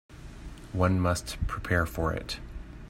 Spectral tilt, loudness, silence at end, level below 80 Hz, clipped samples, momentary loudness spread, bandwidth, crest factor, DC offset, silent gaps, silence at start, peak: -5.5 dB/octave; -30 LUFS; 0 s; -40 dBFS; under 0.1%; 20 LU; 16 kHz; 20 dB; under 0.1%; none; 0.1 s; -10 dBFS